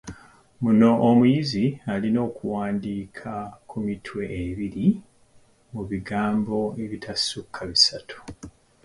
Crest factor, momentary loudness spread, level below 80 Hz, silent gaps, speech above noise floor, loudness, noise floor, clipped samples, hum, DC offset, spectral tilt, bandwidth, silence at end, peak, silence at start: 20 dB; 18 LU; -52 dBFS; none; 33 dB; -24 LUFS; -57 dBFS; under 0.1%; none; under 0.1%; -5.5 dB/octave; 11.5 kHz; 0.35 s; -4 dBFS; 0.05 s